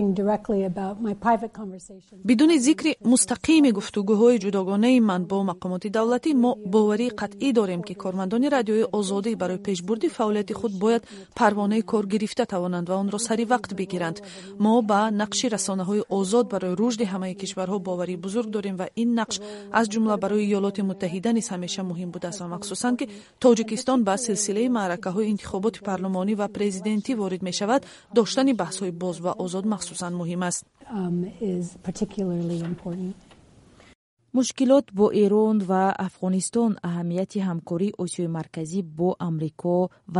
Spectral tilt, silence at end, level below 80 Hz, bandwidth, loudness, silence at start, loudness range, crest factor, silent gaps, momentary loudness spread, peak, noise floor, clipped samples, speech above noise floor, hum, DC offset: -5 dB/octave; 0 s; -60 dBFS; 11.5 kHz; -24 LUFS; 0 s; 6 LU; 18 dB; 33.95-34.17 s; 10 LU; -6 dBFS; -53 dBFS; under 0.1%; 29 dB; none; under 0.1%